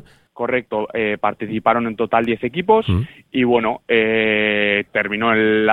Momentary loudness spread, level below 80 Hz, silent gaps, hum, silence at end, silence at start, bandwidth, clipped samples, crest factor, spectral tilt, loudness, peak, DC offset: 6 LU; -46 dBFS; none; none; 0 s; 0.35 s; 4.2 kHz; under 0.1%; 16 dB; -8 dB/octave; -18 LUFS; -2 dBFS; under 0.1%